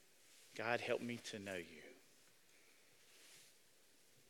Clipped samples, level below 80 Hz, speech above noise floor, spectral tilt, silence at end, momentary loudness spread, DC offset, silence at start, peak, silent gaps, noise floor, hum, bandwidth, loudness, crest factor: under 0.1%; under -90 dBFS; 28 dB; -4 dB/octave; 0.8 s; 26 LU; under 0.1%; 0.25 s; -24 dBFS; none; -72 dBFS; none; 18 kHz; -45 LUFS; 26 dB